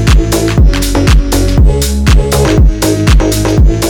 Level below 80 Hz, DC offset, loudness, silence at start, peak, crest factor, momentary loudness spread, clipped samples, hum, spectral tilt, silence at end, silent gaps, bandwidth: -10 dBFS; under 0.1%; -9 LUFS; 0 s; 0 dBFS; 6 dB; 2 LU; under 0.1%; none; -5.5 dB/octave; 0 s; none; 19 kHz